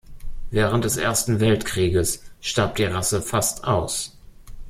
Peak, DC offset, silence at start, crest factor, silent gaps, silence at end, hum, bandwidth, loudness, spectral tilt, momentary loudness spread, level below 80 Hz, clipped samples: -4 dBFS; under 0.1%; 0.1 s; 18 dB; none; 0 s; none; 16.5 kHz; -22 LUFS; -4 dB/octave; 7 LU; -38 dBFS; under 0.1%